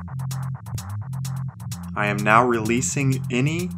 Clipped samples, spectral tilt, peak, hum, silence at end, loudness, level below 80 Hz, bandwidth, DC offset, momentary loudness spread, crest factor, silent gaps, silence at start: under 0.1%; -5.5 dB/octave; 0 dBFS; none; 0 s; -23 LUFS; -58 dBFS; 16 kHz; under 0.1%; 14 LU; 22 dB; none; 0 s